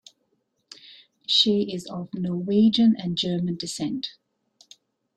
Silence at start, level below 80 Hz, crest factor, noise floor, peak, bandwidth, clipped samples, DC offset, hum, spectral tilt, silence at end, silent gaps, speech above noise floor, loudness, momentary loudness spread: 0.9 s; -66 dBFS; 18 dB; -72 dBFS; -6 dBFS; 10.5 kHz; under 0.1%; under 0.1%; none; -5.5 dB/octave; 1.05 s; none; 49 dB; -23 LUFS; 17 LU